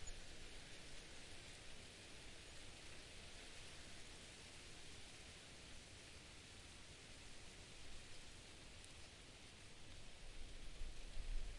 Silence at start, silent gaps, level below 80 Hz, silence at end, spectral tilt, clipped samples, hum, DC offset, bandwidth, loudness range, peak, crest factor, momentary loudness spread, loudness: 0 s; none; -58 dBFS; 0 s; -2.5 dB/octave; under 0.1%; none; under 0.1%; 11.5 kHz; 2 LU; -34 dBFS; 20 dB; 3 LU; -58 LUFS